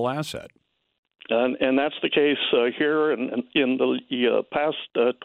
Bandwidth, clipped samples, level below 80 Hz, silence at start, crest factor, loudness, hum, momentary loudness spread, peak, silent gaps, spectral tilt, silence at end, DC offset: 13 kHz; under 0.1%; -66 dBFS; 0 s; 16 dB; -23 LUFS; none; 6 LU; -8 dBFS; 0.98-1.03 s; -5.5 dB/octave; 0 s; under 0.1%